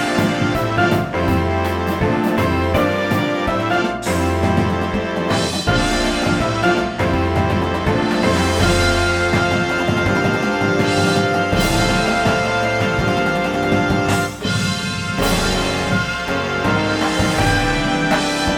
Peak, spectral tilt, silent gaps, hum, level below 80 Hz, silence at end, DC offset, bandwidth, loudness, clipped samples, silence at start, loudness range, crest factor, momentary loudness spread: -2 dBFS; -5 dB/octave; none; none; -32 dBFS; 0 s; under 0.1%; 19.5 kHz; -17 LUFS; under 0.1%; 0 s; 2 LU; 16 dB; 3 LU